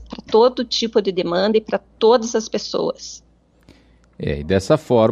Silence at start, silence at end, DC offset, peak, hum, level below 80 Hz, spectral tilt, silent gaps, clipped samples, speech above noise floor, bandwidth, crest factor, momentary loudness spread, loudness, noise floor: 0 s; 0 s; under 0.1%; -4 dBFS; none; -44 dBFS; -5 dB/octave; none; under 0.1%; 34 dB; 10.5 kHz; 16 dB; 11 LU; -19 LUFS; -51 dBFS